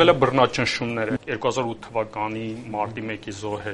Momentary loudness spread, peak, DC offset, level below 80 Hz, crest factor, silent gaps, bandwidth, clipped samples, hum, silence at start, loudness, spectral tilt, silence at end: 12 LU; 0 dBFS; under 0.1%; -54 dBFS; 22 dB; none; 11 kHz; under 0.1%; none; 0 s; -24 LUFS; -5 dB/octave; 0 s